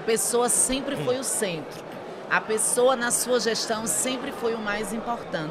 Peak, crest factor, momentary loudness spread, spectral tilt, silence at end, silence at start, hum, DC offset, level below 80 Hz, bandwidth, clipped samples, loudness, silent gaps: -8 dBFS; 18 dB; 10 LU; -2 dB/octave; 0 s; 0 s; none; under 0.1%; -54 dBFS; 16 kHz; under 0.1%; -24 LUFS; none